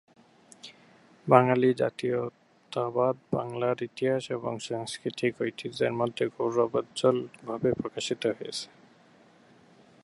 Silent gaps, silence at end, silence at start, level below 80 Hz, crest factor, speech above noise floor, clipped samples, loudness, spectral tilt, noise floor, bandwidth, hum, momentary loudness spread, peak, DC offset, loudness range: none; 1.4 s; 0.65 s; -68 dBFS; 26 dB; 31 dB; under 0.1%; -29 LUFS; -5.5 dB/octave; -58 dBFS; 11.5 kHz; none; 13 LU; -2 dBFS; under 0.1%; 4 LU